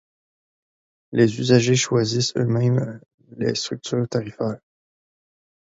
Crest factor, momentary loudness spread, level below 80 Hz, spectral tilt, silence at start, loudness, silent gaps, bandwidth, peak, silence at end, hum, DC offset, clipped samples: 22 dB; 11 LU; -60 dBFS; -5.5 dB/octave; 1.1 s; -21 LUFS; 3.14-3.18 s; 8 kHz; -2 dBFS; 1.1 s; none; under 0.1%; under 0.1%